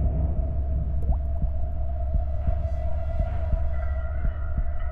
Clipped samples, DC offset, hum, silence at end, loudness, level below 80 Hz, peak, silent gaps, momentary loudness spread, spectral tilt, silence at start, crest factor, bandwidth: under 0.1%; under 0.1%; none; 0 s; -29 LUFS; -26 dBFS; -12 dBFS; none; 3 LU; -11 dB/octave; 0 s; 12 dB; 3 kHz